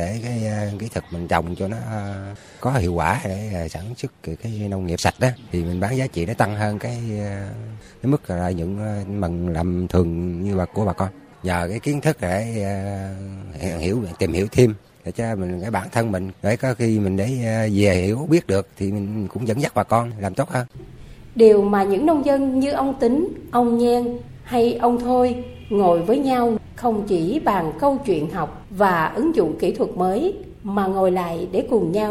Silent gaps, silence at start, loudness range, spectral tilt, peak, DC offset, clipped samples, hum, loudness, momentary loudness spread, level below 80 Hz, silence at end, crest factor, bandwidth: none; 0 s; 6 LU; -7 dB/octave; 0 dBFS; under 0.1%; under 0.1%; none; -21 LUFS; 11 LU; -44 dBFS; 0 s; 20 dB; 16 kHz